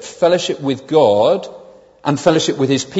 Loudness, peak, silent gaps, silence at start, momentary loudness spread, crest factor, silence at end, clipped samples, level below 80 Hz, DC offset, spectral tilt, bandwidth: -15 LUFS; 0 dBFS; none; 0 s; 9 LU; 16 dB; 0 s; under 0.1%; -58 dBFS; under 0.1%; -5 dB/octave; 8 kHz